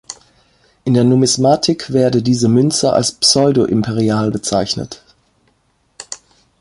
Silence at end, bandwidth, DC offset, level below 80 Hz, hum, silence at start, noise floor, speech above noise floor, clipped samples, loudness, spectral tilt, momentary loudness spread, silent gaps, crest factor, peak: 0.45 s; 11.5 kHz; under 0.1%; -48 dBFS; none; 0.1 s; -60 dBFS; 47 dB; under 0.1%; -14 LUFS; -5 dB/octave; 19 LU; none; 16 dB; 0 dBFS